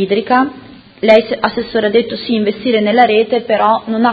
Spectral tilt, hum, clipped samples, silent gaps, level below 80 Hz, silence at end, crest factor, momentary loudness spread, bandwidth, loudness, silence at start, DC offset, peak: -7 dB/octave; none; 0.1%; none; -52 dBFS; 0 s; 12 dB; 7 LU; 7 kHz; -13 LUFS; 0 s; under 0.1%; 0 dBFS